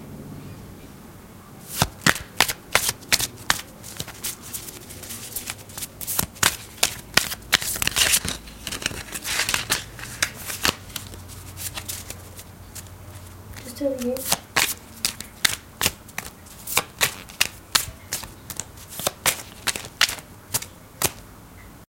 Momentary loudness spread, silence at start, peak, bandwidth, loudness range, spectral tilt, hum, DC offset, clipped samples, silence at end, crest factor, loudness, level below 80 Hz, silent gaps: 19 LU; 0 s; 0 dBFS; 17 kHz; 7 LU; -1 dB/octave; none; under 0.1%; under 0.1%; 0.05 s; 28 dB; -24 LUFS; -48 dBFS; none